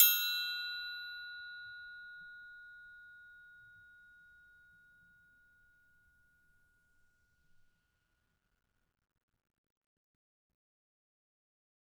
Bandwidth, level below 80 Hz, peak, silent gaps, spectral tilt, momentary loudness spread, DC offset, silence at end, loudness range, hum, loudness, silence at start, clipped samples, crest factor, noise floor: over 20 kHz; -80 dBFS; -10 dBFS; none; 4.5 dB/octave; 25 LU; under 0.1%; 8.1 s; 24 LU; none; -36 LUFS; 0 s; under 0.1%; 34 dB; -80 dBFS